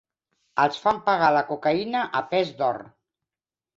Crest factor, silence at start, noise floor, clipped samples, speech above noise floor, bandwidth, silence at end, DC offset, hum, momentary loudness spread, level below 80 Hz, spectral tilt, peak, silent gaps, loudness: 20 dB; 0.55 s; under -90 dBFS; under 0.1%; over 67 dB; 7.8 kHz; 0.9 s; under 0.1%; none; 7 LU; -66 dBFS; -5.5 dB/octave; -6 dBFS; none; -23 LUFS